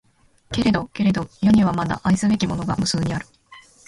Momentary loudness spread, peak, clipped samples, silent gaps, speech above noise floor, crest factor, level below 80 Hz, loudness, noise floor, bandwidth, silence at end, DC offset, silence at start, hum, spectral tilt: 9 LU; -6 dBFS; under 0.1%; none; 30 dB; 16 dB; -44 dBFS; -21 LUFS; -50 dBFS; 11.5 kHz; 0.25 s; under 0.1%; 0.5 s; none; -5.5 dB/octave